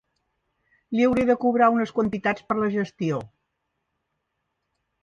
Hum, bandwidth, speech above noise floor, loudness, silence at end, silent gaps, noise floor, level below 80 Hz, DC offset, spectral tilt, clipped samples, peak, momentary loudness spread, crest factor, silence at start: none; 7.2 kHz; 56 dB; -23 LUFS; 1.75 s; none; -78 dBFS; -58 dBFS; under 0.1%; -7.5 dB/octave; under 0.1%; -6 dBFS; 9 LU; 18 dB; 0.9 s